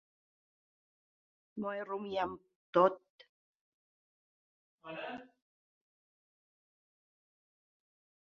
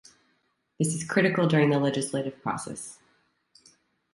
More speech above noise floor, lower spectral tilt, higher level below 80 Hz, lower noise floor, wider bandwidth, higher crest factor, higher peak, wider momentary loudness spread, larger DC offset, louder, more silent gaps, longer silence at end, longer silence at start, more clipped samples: first, over 56 dB vs 47 dB; second, -4 dB/octave vs -5.5 dB/octave; second, -80 dBFS vs -68 dBFS; first, under -90 dBFS vs -72 dBFS; second, 6.8 kHz vs 11.5 kHz; first, 28 dB vs 20 dB; second, -14 dBFS vs -8 dBFS; first, 21 LU vs 14 LU; neither; second, -35 LUFS vs -26 LUFS; first, 2.56-2.73 s, 3.10-3.19 s, 3.29-4.78 s vs none; first, 3 s vs 1.2 s; first, 1.55 s vs 0.8 s; neither